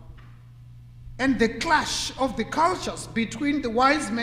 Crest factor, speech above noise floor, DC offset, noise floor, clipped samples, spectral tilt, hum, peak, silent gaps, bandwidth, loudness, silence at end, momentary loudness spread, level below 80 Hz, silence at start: 18 dB; 22 dB; under 0.1%; -46 dBFS; under 0.1%; -3.5 dB/octave; none; -6 dBFS; none; 15.5 kHz; -24 LUFS; 0 s; 8 LU; -46 dBFS; 0 s